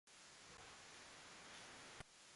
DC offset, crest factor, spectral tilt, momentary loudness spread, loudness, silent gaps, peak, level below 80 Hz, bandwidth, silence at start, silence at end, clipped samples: under 0.1%; 24 dB; -1.5 dB/octave; 3 LU; -58 LUFS; none; -38 dBFS; -78 dBFS; 11.5 kHz; 0.05 s; 0 s; under 0.1%